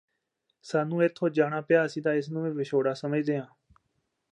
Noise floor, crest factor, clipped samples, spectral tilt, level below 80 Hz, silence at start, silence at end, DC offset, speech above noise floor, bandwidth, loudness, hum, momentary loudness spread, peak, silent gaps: -79 dBFS; 18 dB; under 0.1%; -7 dB/octave; -76 dBFS; 0.65 s; 0.85 s; under 0.1%; 52 dB; 10 kHz; -28 LUFS; none; 7 LU; -10 dBFS; none